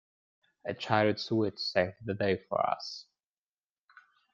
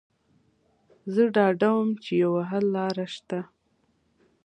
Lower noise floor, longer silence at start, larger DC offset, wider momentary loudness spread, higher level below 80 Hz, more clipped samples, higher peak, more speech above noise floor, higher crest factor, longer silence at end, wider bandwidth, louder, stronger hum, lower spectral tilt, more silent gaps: first, under -90 dBFS vs -69 dBFS; second, 0.65 s vs 1.05 s; neither; about the same, 13 LU vs 13 LU; about the same, -72 dBFS vs -74 dBFS; neither; about the same, -10 dBFS vs -8 dBFS; first, over 59 dB vs 45 dB; about the same, 22 dB vs 20 dB; first, 1.3 s vs 1 s; second, 7.6 kHz vs 9.6 kHz; second, -31 LUFS vs -25 LUFS; neither; second, -6 dB/octave vs -7.5 dB/octave; neither